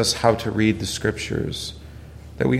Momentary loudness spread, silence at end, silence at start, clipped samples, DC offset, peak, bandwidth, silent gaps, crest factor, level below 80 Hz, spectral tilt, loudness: 21 LU; 0 s; 0 s; under 0.1%; under 0.1%; -2 dBFS; 15.5 kHz; none; 20 dB; -42 dBFS; -4.5 dB/octave; -23 LUFS